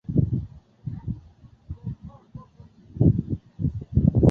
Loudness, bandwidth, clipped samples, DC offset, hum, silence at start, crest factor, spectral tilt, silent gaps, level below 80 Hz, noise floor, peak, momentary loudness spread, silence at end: -26 LUFS; 1.9 kHz; under 0.1%; under 0.1%; none; 0.1 s; 20 dB; -12.5 dB/octave; none; -36 dBFS; -51 dBFS; -4 dBFS; 22 LU; 0 s